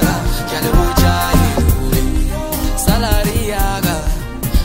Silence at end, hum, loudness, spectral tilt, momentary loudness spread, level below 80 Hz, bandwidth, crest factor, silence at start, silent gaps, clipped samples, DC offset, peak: 0 s; none; -16 LUFS; -5 dB/octave; 6 LU; -18 dBFS; 16.5 kHz; 14 dB; 0 s; none; under 0.1%; under 0.1%; 0 dBFS